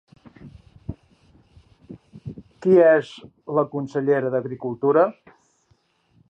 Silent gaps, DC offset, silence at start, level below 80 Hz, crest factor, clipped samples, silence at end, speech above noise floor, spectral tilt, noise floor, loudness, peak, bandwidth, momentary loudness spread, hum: none; under 0.1%; 0.45 s; -56 dBFS; 18 dB; under 0.1%; 1.2 s; 45 dB; -8.5 dB/octave; -64 dBFS; -20 LUFS; -4 dBFS; 8 kHz; 24 LU; none